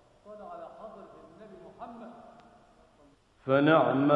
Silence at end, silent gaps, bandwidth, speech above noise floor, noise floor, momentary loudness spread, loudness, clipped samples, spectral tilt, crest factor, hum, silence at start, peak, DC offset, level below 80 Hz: 0 s; none; 5.2 kHz; 33 dB; -62 dBFS; 28 LU; -24 LUFS; under 0.1%; -8.5 dB/octave; 22 dB; none; 0.3 s; -10 dBFS; under 0.1%; -70 dBFS